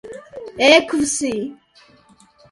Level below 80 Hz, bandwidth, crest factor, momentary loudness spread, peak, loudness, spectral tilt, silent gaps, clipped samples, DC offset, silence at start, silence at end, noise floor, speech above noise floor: -56 dBFS; 11.5 kHz; 20 dB; 22 LU; 0 dBFS; -16 LUFS; -2 dB/octave; none; under 0.1%; under 0.1%; 0.05 s; 0.95 s; -52 dBFS; 36 dB